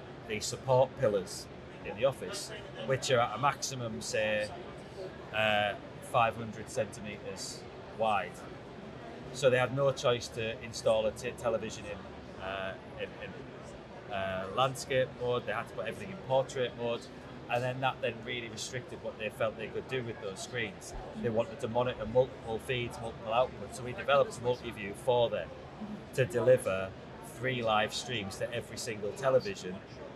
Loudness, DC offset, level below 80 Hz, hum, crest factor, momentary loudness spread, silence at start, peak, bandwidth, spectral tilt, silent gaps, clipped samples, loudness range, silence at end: -33 LUFS; under 0.1%; -60 dBFS; none; 20 dB; 16 LU; 0 s; -14 dBFS; 13.5 kHz; -4.5 dB/octave; none; under 0.1%; 4 LU; 0 s